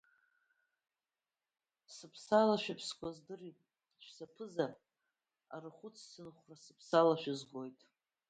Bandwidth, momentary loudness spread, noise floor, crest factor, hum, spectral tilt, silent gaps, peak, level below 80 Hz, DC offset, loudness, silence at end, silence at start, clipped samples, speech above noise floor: 9 kHz; 24 LU; under -90 dBFS; 24 dB; none; -5 dB/octave; none; -16 dBFS; -82 dBFS; under 0.1%; -35 LUFS; 0.6 s; 1.9 s; under 0.1%; over 52 dB